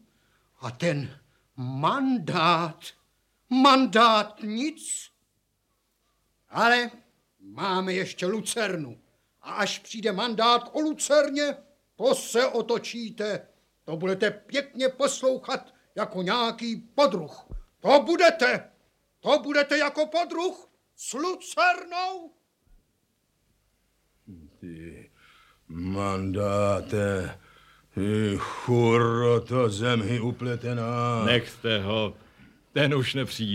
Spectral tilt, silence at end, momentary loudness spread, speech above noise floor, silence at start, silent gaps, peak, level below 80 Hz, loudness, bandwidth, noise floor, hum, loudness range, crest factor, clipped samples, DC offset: -4.5 dB/octave; 0 s; 15 LU; 48 dB; 0.6 s; none; -4 dBFS; -58 dBFS; -25 LUFS; 16 kHz; -74 dBFS; none; 7 LU; 22 dB; under 0.1%; under 0.1%